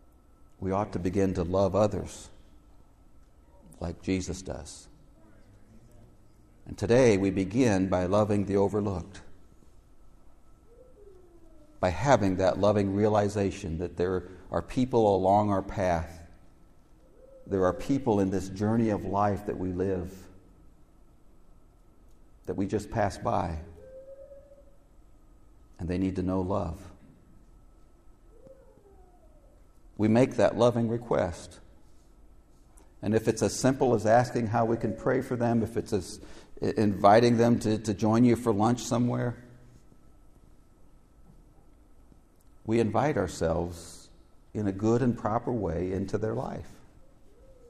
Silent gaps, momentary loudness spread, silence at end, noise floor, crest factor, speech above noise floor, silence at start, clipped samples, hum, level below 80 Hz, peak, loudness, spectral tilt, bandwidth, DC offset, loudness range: none; 17 LU; 0.95 s; -56 dBFS; 22 dB; 30 dB; 0.6 s; under 0.1%; none; -52 dBFS; -6 dBFS; -27 LUFS; -6.5 dB/octave; 14 kHz; under 0.1%; 11 LU